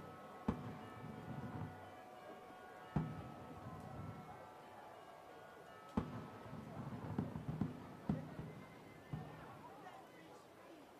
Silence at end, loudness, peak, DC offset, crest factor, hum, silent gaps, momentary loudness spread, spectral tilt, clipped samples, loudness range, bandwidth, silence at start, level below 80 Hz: 0 s; -50 LUFS; -24 dBFS; under 0.1%; 26 dB; none; none; 13 LU; -7.5 dB/octave; under 0.1%; 4 LU; 15 kHz; 0 s; -64 dBFS